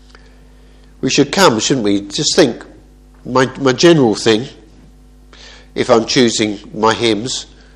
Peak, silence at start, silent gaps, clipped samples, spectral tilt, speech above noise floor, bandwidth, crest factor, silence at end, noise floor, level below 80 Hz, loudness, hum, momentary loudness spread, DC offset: 0 dBFS; 1.05 s; none; 0.1%; -4 dB/octave; 29 dB; 13 kHz; 16 dB; 0.3 s; -42 dBFS; -44 dBFS; -13 LUFS; none; 12 LU; under 0.1%